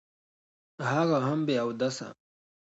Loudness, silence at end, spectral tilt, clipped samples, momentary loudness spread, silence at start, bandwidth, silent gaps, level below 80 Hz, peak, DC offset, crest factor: -29 LUFS; 0.65 s; -6 dB/octave; under 0.1%; 11 LU; 0.8 s; 8.2 kHz; none; -76 dBFS; -14 dBFS; under 0.1%; 18 dB